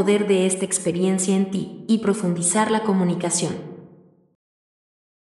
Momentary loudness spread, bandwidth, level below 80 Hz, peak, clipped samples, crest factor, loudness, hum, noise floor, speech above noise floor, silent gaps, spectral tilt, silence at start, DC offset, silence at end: 8 LU; 11.5 kHz; -68 dBFS; -6 dBFS; under 0.1%; 16 dB; -21 LUFS; none; -51 dBFS; 30 dB; none; -4.5 dB/octave; 0 s; under 0.1%; 1.35 s